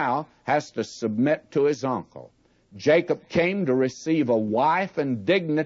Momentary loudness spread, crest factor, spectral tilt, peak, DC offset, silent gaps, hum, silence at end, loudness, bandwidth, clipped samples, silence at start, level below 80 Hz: 7 LU; 16 dB; -6 dB/octave; -8 dBFS; under 0.1%; none; none; 0 s; -24 LUFS; 7.8 kHz; under 0.1%; 0 s; -64 dBFS